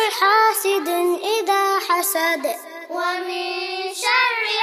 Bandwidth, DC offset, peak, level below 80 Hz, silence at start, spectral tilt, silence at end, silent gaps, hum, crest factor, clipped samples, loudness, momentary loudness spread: 15.5 kHz; under 0.1%; -4 dBFS; under -90 dBFS; 0 s; 1 dB/octave; 0 s; none; none; 16 dB; under 0.1%; -19 LUFS; 9 LU